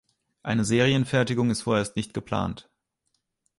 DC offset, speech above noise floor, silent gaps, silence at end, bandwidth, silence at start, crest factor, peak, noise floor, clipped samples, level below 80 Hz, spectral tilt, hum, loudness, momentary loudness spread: under 0.1%; 52 dB; none; 1 s; 11.5 kHz; 0.45 s; 20 dB; -8 dBFS; -77 dBFS; under 0.1%; -52 dBFS; -5.5 dB/octave; none; -25 LUFS; 11 LU